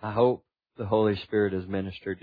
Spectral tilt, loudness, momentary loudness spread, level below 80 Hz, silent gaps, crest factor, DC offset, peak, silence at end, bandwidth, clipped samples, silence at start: -10 dB/octave; -27 LUFS; 10 LU; -60 dBFS; none; 18 dB; under 0.1%; -10 dBFS; 0.05 s; 5 kHz; under 0.1%; 0 s